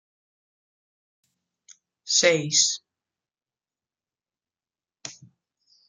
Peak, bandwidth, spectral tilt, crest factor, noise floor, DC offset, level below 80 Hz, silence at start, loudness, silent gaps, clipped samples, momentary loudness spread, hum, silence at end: -4 dBFS; 10.5 kHz; -1 dB/octave; 26 dB; under -90 dBFS; under 0.1%; -80 dBFS; 2.05 s; -20 LUFS; none; under 0.1%; 22 LU; none; 0.75 s